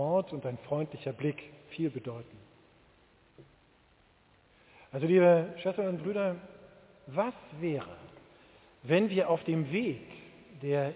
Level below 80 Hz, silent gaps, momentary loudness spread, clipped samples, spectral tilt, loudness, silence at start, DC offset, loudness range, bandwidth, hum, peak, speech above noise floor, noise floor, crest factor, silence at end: -70 dBFS; none; 21 LU; under 0.1%; -6.5 dB/octave; -31 LUFS; 0 s; under 0.1%; 13 LU; 4 kHz; none; -14 dBFS; 34 dB; -65 dBFS; 20 dB; 0 s